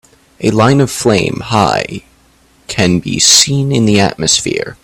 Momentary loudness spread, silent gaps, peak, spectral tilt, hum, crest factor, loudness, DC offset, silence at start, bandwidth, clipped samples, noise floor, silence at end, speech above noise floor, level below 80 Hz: 11 LU; none; 0 dBFS; -3.5 dB/octave; none; 12 dB; -11 LUFS; under 0.1%; 0.4 s; over 20 kHz; 0.1%; -49 dBFS; 0.1 s; 37 dB; -42 dBFS